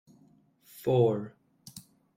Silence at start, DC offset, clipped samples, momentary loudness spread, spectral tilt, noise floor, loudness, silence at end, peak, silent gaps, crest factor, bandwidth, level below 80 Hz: 0.75 s; under 0.1%; under 0.1%; 23 LU; -8 dB/octave; -63 dBFS; -28 LUFS; 0.35 s; -14 dBFS; none; 18 dB; 16.5 kHz; -70 dBFS